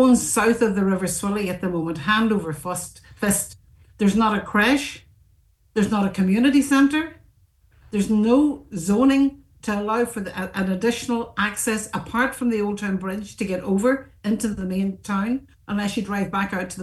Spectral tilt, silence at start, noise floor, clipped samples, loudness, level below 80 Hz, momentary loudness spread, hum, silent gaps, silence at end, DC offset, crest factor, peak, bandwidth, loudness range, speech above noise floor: -5 dB/octave; 0 s; -59 dBFS; under 0.1%; -22 LUFS; -50 dBFS; 11 LU; none; none; 0 s; under 0.1%; 16 dB; -6 dBFS; 12.5 kHz; 4 LU; 37 dB